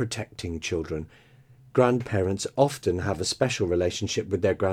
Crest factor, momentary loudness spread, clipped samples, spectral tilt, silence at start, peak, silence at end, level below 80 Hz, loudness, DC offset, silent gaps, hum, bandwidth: 20 dB; 10 LU; under 0.1%; -5 dB/octave; 0 s; -6 dBFS; 0 s; -50 dBFS; -26 LUFS; under 0.1%; none; none; 16 kHz